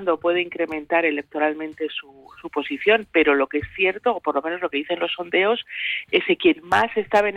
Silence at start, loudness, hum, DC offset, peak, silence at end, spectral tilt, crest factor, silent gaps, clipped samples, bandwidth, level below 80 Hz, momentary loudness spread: 0 s; -22 LUFS; none; under 0.1%; -6 dBFS; 0 s; -5 dB/octave; 16 dB; none; under 0.1%; 11 kHz; -56 dBFS; 10 LU